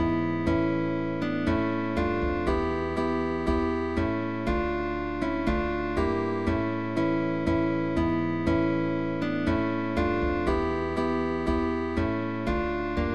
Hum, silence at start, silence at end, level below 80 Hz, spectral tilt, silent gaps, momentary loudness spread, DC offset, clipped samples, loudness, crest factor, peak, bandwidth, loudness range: none; 0 s; 0 s; -38 dBFS; -8 dB/octave; none; 3 LU; 0.6%; under 0.1%; -27 LUFS; 14 dB; -12 dBFS; 8.6 kHz; 1 LU